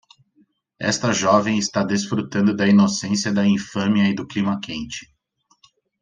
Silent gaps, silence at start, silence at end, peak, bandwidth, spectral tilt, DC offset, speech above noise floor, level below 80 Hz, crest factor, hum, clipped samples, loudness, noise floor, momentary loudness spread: none; 0.8 s; 0.95 s; -2 dBFS; 9.6 kHz; -5 dB/octave; under 0.1%; 45 dB; -58 dBFS; 18 dB; none; under 0.1%; -20 LUFS; -65 dBFS; 11 LU